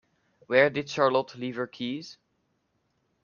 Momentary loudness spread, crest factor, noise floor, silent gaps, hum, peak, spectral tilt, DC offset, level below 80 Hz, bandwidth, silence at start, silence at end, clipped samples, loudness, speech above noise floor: 13 LU; 24 dB; -74 dBFS; none; none; -6 dBFS; -5 dB/octave; under 0.1%; -72 dBFS; 7.2 kHz; 0.5 s; 1.1 s; under 0.1%; -27 LUFS; 48 dB